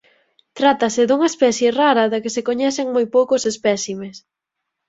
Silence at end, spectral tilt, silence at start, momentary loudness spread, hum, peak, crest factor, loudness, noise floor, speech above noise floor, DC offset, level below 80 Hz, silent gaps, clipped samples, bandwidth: 0.7 s; -3.5 dB/octave; 0.55 s; 7 LU; none; -2 dBFS; 16 dB; -18 LUFS; -80 dBFS; 62 dB; under 0.1%; -64 dBFS; none; under 0.1%; 8 kHz